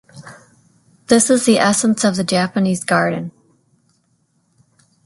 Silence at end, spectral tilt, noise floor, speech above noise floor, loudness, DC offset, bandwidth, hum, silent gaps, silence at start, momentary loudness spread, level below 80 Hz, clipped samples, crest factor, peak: 1.75 s; -4 dB/octave; -63 dBFS; 48 dB; -15 LUFS; under 0.1%; 12 kHz; none; none; 0.15 s; 7 LU; -58 dBFS; under 0.1%; 18 dB; 0 dBFS